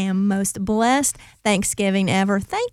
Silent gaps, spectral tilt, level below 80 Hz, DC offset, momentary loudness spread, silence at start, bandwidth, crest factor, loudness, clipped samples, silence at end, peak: none; -4.5 dB/octave; -48 dBFS; under 0.1%; 4 LU; 0 s; 15.5 kHz; 16 dB; -20 LUFS; under 0.1%; 0.05 s; -4 dBFS